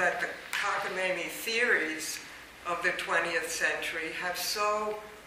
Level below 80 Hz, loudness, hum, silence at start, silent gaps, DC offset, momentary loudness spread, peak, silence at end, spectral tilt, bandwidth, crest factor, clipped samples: -66 dBFS; -30 LUFS; none; 0 s; none; under 0.1%; 9 LU; -14 dBFS; 0 s; -1.5 dB/octave; 16 kHz; 18 dB; under 0.1%